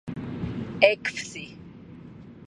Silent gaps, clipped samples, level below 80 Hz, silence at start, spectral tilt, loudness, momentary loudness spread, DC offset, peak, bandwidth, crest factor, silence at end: none; under 0.1%; -52 dBFS; 0.05 s; -4.5 dB/octave; -26 LUFS; 25 LU; under 0.1%; -2 dBFS; 11 kHz; 28 dB; 0 s